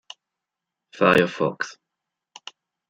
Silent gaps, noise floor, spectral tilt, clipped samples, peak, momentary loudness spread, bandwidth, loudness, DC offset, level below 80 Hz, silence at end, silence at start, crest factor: none; -85 dBFS; -5.5 dB/octave; under 0.1%; -2 dBFS; 24 LU; 13.5 kHz; -21 LUFS; under 0.1%; -64 dBFS; 1.2 s; 0.95 s; 24 dB